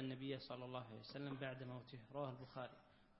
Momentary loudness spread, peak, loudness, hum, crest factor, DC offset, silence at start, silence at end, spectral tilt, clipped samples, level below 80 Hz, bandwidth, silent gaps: 6 LU; -32 dBFS; -51 LUFS; none; 20 dB; under 0.1%; 0 s; 0 s; -5 dB/octave; under 0.1%; -78 dBFS; 5.6 kHz; none